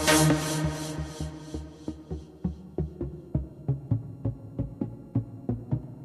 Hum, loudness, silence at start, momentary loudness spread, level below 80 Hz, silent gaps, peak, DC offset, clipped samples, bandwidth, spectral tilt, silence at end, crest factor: none; -31 LUFS; 0 s; 13 LU; -44 dBFS; none; -6 dBFS; under 0.1%; under 0.1%; 14 kHz; -4.5 dB/octave; 0 s; 24 dB